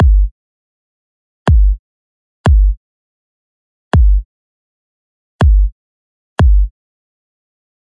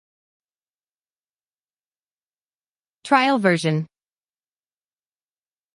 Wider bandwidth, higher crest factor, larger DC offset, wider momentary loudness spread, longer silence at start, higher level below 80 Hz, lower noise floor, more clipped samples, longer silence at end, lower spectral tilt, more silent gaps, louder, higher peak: second, 4.7 kHz vs 11.5 kHz; second, 14 dB vs 24 dB; neither; about the same, 10 LU vs 10 LU; second, 0 s vs 3.05 s; first, -14 dBFS vs -76 dBFS; about the same, under -90 dBFS vs under -90 dBFS; neither; second, 1.15 s vs 1.9 s; first, -8 dB/octave vs -5.5 dB/octave; first, 0.31-1.46 s, 1.79-2.44 s, 2.77-3.91 s, 4.25-5.39 s, 5.72-6.36 s vs none; first, -14 LUFS vs -19 LUFS; first, 0 dBFS vs -4 dBFS